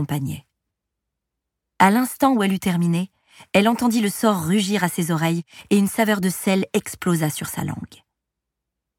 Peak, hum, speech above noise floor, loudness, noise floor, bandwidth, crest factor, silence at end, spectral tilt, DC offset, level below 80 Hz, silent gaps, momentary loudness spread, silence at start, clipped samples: -2 dBFS; none; 62 dB; -21 LUFS; -82 dBFS; 18 kHz; 20 dB; 1.1 s; -5.5 dB/octave; under 0.1%; -58 dBFS; none; 10 LU; 0 s; under 0.1%